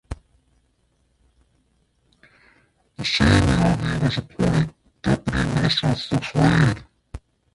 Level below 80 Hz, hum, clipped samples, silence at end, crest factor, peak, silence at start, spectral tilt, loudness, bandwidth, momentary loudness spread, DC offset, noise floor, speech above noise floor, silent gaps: -36 dBFS; none; under 0.1%; 0.4 s; 18 dB; -4 dBFS; 0.1 s; -6 dB/octave; -21 LUFS; 11.5 kHz; 22 LU; under 0.1%; -65 dBFS; 46 dB; none